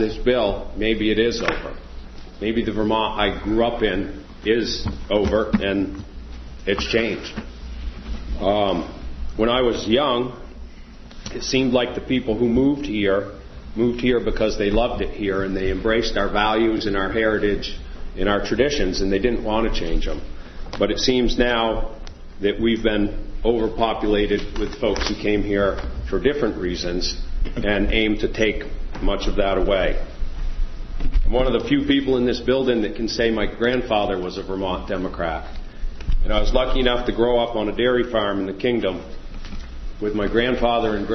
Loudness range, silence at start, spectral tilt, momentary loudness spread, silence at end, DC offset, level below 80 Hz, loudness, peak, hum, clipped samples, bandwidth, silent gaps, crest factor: 3 LU; 0 s; -5.5 dB/octave; 15 LU; 0 s; under 0.1%; -28 dBFS; -22 LUFS; -2 dBFS; none; under 0.1%; 6.4 kHz; none; 20 dB